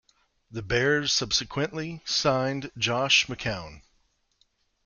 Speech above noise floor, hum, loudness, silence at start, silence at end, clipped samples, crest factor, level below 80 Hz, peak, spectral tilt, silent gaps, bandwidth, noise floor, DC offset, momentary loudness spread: 43 dB; none; -25 LUFS; 0.5 s; 1.05 s; under 0.1%; 20 dB; -52 dBFS; -8 dBFS; -3 dB/octave; none; 10 kHz; -69 dBFS; under 0.1%; 14 LU